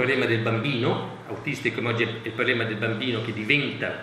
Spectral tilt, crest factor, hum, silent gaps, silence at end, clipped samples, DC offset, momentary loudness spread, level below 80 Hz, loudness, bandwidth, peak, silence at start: -6 dB/octave; 20 dB; none; none; 0 s; under 0.1%; under 0.1%; 7 LU; -64 dBFS; -25 LUFS; 12.5 kHz; -4 dBFS; 0 s